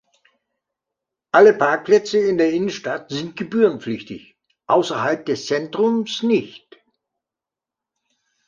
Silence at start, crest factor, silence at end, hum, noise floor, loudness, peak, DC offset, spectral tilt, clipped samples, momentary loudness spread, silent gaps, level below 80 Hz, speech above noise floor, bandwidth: 1.35 s; 20 dB; 1.9 s; none; -88 dBFS; -19 LUFS; -2 dBFS; under 0.1%; -5 dB/octave; under 0.1%; 15 LU; none; -66 dBFS; 69 dB; 7.4 kHz